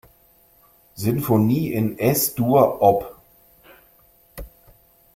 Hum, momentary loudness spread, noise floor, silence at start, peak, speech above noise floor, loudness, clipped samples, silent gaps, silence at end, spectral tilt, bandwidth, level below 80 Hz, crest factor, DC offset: none; 23 LU; -56 dBFS; 0.95 s; -2 dBFS; 37 dB; -19 LUFS; under 0.1%; none; 0.7 s; -6 dB/octave; 16.5 kHz; -50 dBFS; 20 dB; under 0.1%